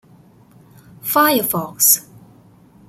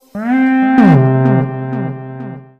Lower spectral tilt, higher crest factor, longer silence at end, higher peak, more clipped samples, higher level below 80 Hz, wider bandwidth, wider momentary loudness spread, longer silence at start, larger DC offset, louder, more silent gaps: second, -2 dB/octave vs -10 dB/octave; first, 20 dB vs 12 dB; first, 0.9 s vs 0.15 s; about the same, 0 dBFS vs 0 dBFS; neither; second, -60 dBFS vs -50 dBFS; first, 16.5 kHz vs 5.4 kHz; second, 8 LU vs 18 LU; first, 1.05 s vs 0.15 s; neither; second, -15 LUFS vs -12 LUFS; neither